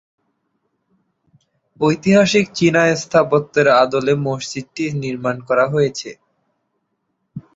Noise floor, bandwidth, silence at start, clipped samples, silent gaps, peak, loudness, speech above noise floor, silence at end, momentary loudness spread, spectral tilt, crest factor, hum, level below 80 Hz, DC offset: -71 dBFS; 8 kHz; 1.8 s; under 0.1%; none; -2 dBFS; -16 LUFS; 55 dB; 0.15 s; 12 LU; -5.5 dB/octave; 16 dB; none; -56 dBFS; under 0.1%